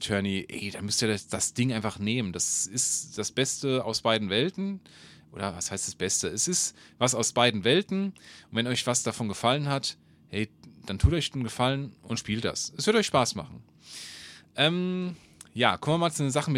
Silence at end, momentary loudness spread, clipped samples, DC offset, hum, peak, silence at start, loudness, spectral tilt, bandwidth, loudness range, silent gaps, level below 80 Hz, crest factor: 0 s; 13 LU; under 0.1%; under 0.1%; none; -6 dBFS; 0 s; -27 LUFS; -3.5 dB/octave; 16 kHz; 3 LU; none; -44 dBFS; 24 dB